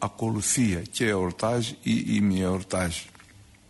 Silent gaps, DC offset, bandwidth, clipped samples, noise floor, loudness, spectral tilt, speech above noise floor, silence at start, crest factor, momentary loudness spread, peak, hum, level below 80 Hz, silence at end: none; under 0.1%; 12 kHz; under 0.1%; -52 dBFS; -26 LUFS; -4.5 dB/octave; 27 dB; 0 s; 14 dB; 5 LU; -12 dBFS; none; -52 dBFS; 0.25 s